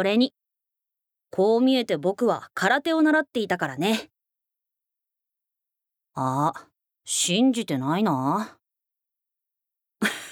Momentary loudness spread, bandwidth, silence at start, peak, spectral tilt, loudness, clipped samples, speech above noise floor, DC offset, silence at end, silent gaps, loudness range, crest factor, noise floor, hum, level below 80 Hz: 9 LU; 18.5 kHz; 0 s; -6 dBFS; -4 dB/octave; -24 LUFS; under 0.1%; 61 dB; under 0.1%; 0 s; none; 8 LU; 20 dB; -84 dBFS; none; -76 dBFS